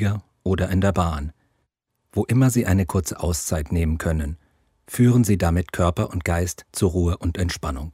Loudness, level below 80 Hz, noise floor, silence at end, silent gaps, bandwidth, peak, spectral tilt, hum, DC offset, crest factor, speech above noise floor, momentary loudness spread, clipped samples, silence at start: -22 LUFS; -34 dBFS; -73 dBFS; 0.05 s; none; 16 kHz; -6 dBFS; -6 dB/octave; none; under 0.1%; 16 dB; 53 dB; 10 LU; under 0.1%; 0 s